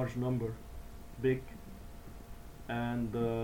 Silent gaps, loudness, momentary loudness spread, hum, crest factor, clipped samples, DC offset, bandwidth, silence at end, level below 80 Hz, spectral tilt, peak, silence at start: none; -36 LUFS; 18 LU; none; 16 dB; under 0.1%; 0.1%; 18.5 kHz; 0 s; -50 dBFS; -8 dB/octave; -20 dBFS; 0 s